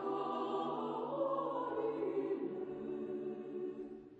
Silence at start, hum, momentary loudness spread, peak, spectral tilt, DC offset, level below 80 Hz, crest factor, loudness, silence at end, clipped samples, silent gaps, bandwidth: 0 s; none; 6 LU; -26 dBFS; -8 dB/octave; under 0.1%; -80 dBFS; 14 dB; -40 LUFS; 0 s; under 0.1%; none; 7.8 kHz